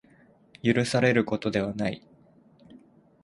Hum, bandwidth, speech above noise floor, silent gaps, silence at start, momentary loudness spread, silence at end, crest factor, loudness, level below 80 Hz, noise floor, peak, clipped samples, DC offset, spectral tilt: none; 11.5 kHz; 33 dB; none; 0.65 s; 9 LU; 0.45 s; 22 dB; -26 LUFS; -60 dBFS; -58 dBFS; -8 dBFS; under 0.1%; under 0.1%; -6 dB/octave